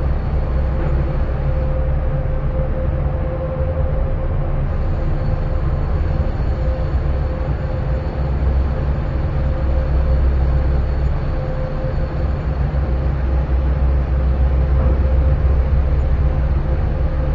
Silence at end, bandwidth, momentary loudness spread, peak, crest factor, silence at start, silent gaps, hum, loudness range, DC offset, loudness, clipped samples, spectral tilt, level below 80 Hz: 0 s; 4.8 kHz; 5 LU; -4 dBFS; 12 dB; 0 s; none; none; 3 LU; under 0.1%; -20 LUFS; under 0.1%; -10 dB/octave; -18 dBFS